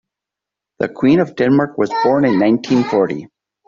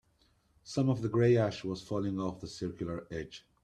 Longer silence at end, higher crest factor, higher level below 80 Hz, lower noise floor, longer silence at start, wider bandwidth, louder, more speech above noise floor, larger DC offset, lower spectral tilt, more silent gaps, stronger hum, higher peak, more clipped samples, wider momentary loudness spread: first, 0.4 s vs 0.25 s; about the same, 14 dB vs 18 dB; first, -56 dBFS vs -62 dBFS; first, -85 dBFS vs -70 dBFS; first, 0.8 s vs 0.65 s; second, 7.4 kHz vs 10 kHz; first, -15 LUFS vs -33 LUFS; first, 70 dB vs 38 dB; neither; about the same, -7.5 dB/octave vs -7 dB/octave; neither; neither; first, -2 dBFS vs -16 dBFS; neither; second, 8 LU vs 13 LU